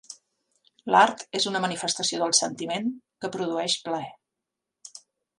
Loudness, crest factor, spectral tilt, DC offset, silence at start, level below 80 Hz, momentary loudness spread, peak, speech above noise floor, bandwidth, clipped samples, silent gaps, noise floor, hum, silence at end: -25 LUFS; 22 dB; -2 dB/octave; under 0.1%; 0.1 s; -76 dBFS; 25 LU; -6 dBFS; 60 dB; 11.5 kHz; under 0.1%; none; -86 dBFS; none; 0.4 s